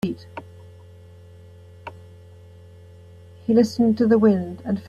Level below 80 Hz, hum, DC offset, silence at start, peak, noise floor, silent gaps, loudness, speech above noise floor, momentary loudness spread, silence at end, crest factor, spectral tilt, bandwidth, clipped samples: -62 dBFS; none; under 0.1%; 0.05 s; -6 dBFS; -45 dBFS; none; -20 LUFS; 26 dB; 24 LU; 0 s; 18 dB; -7.5 dB/octave; 9.4 kHz; under 0.1%